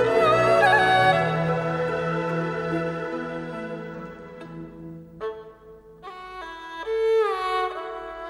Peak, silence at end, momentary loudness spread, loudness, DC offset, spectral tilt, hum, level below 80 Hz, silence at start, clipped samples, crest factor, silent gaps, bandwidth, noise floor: -6 dBFS; 0 s; 22 LU; -23 LUFS; under 0.1%; -6 dB/octave; none; -54 dBFS; 0 s; under 0.1%; 18 dB; none; 12.5 kHz; -47 dBFS